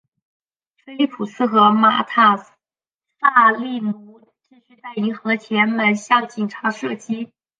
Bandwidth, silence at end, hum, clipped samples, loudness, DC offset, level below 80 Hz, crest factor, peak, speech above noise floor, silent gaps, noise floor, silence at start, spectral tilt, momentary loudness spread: 9.2 kHz; 0.35 s; none; under 0.1%; -18 LUFS; under 0.1%; -74 dBFS; 18 dB; -2 dBFS; over 72 dB; 2.95-2.99 s; under -90 dBFS; 0.9 s; -5 dB/octave; 14 LU